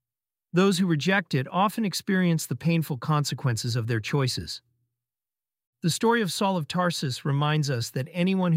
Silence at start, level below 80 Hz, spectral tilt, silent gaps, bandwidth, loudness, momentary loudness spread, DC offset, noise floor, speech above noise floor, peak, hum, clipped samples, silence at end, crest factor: 0.55 s; -62 dBFS; -5.5 dB/octave; 5.67-5.73 s; 16 kHz; -26 LUFS; 6 LU; under 0.1%; under -90 dBFS; over 65 dB; -8 dBFS; none; under 0.1%; 0 s; 18 dB